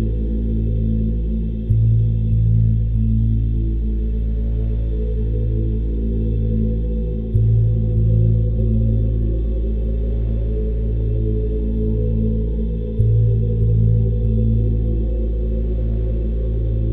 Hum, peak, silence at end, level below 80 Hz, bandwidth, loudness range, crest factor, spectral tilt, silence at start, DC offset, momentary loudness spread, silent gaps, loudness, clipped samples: none; -4 dBFS; 0 s; -20 dBFS; 0.9 kHz; 3 LU; 14 dB; -13 dB/octave; 0 s; under 0.1%; 6 LU; none; -20 LUFS; under 0.1%